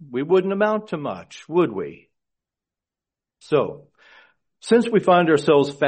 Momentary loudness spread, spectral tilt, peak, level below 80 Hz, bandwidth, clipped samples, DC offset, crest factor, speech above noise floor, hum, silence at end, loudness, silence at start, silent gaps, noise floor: 15 LU; -6.5 dB/octave; -4 dBFS; -66 dBFS; 8.8 kHz; under 0.1%; under 0.1%; 18 dB; 69 dB; none; 0 s; -20 LUFS; 0 s; none; -89 dBFS